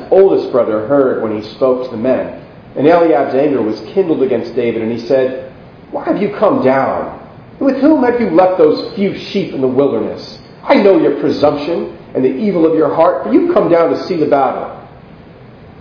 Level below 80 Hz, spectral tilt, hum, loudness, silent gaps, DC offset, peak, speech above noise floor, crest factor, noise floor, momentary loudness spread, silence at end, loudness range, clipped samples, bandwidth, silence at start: -50 dBFS; -8 dB/octave; none; -13 LUFS; none; under 0.1%; 0 dBFS; 24 dB; 12 dB; -37 dBFS; 13 LU; 0.1 s; 3 LU; 0.1%; 5.4 kHz; 0 s